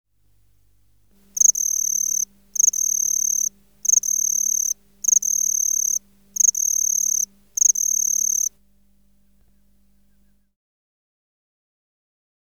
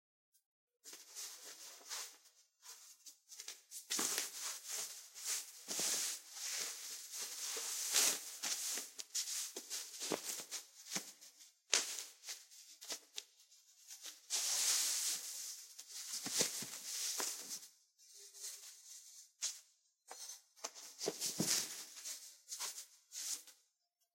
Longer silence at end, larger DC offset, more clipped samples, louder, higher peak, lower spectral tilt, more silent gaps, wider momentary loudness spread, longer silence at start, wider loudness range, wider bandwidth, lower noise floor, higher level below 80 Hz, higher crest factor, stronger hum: first, 4 s vs 0.6 s; first, 0.1% vs under 0.1%; neither; first, -18 LUFS vs -40 LUFS; first, -4 dBFS vs -12 dBFS; second, 2.5 dB/octave vs 0.5 dB/octave; neither; second, 8 LU vs 19 LU; first, 1.35 s vs 0.85 s; second, 4 LU vs 9 LU; first, over 20 kHz vs 16 kHz; second, -62 dBFS vs -84 dBFS; first, -64 dBFS vs under -90 dBFS; second, 18 dB vs 34 dB; neither